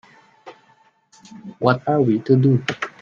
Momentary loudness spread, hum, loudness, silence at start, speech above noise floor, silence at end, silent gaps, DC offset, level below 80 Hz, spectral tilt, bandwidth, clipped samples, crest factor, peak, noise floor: 17 LU; none; -18 LUFS; 0.45 s; 39 dB; 0.15 s; none; under 0.1%; -62 dBFS; -8 dB/octave; 7.2 kHz; under 0.1%; 20 dB; 0 dBFS; -57 dBFS